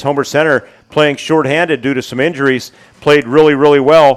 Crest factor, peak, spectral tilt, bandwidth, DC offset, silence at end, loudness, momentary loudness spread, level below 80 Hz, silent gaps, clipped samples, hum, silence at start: 12 dB; 0 dBFS; -5.5 dB/octave; 13.5 kHz; under 0.1%; 0 s; -12 LUFS; 9 LU; -50 dBFS; none; 0.5%; none; 0 s